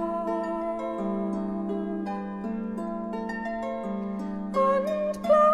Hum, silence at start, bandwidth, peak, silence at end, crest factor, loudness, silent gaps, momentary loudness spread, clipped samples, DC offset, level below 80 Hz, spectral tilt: 50 Hz at -60 dBFS; 0 s; 12.5 kHz; -10 dBFS; 0 s; 18 dB; -29 LUFS; none; 9 LU; under 0.1%; under 0.1%; -56 dBFS; -7.5 dB/octave